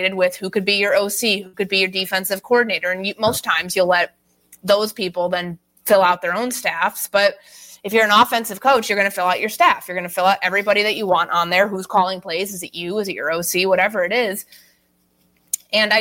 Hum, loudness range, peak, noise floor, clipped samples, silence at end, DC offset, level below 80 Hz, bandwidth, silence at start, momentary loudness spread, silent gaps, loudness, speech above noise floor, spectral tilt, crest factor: none; 3 LU; -2 dBFS; -62 dBFS; under 0.1%; 0 s; under 0.1%; -64 dBFS; 17 kHz; 0 s; 8 LU; none; -18 LUFS; 43 dB; -2.5 dB/octave; 16 dB